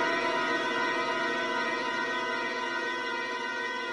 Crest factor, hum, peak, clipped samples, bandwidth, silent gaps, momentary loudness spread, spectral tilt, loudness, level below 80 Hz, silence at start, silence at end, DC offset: 14 dB; none; -16 dBFS; under 0.1%; 11.5 kHz; none; 4 LU; -2.5 dB/octave; -30 LUFS; -80 dBFS; 0 s; 0 s; under 0.1%